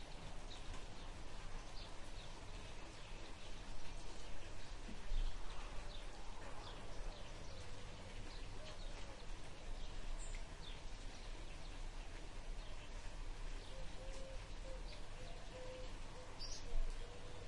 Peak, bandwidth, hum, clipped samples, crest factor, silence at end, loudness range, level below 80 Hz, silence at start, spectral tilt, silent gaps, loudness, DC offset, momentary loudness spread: -28 dBFS; 11 kHz; none; under 0.1%; 16 dB; 0 s; 2 LU; -48 dBFS; 0 s; -4 dB/octave; none; -54 LUFS; under 0.1%; 4 LU